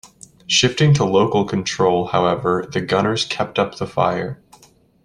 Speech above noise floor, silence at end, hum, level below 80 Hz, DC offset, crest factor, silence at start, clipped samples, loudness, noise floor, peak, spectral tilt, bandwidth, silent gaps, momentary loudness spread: 34 dB; 0.7 s; none; -50 dBFS; under 0.1%; 16 dB; 0.05 s; under 0.1%; -18 LUFS; -52 dBFS; -2 dBFS; -5 dB/octave; 11 kHz; none; 7 LU